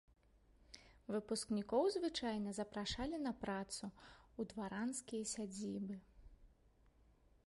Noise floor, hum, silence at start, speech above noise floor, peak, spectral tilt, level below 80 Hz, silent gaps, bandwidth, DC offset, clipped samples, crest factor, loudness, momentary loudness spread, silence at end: -71 dBFS; none; 0.7 s; 29 dB; -26 dBFS; -4 dB/octave; -66 dBFS; none; 11.5 kHz; under 0.1%; under 0.1%; 18 dB; -43 LUFS; 17 LU; 1 s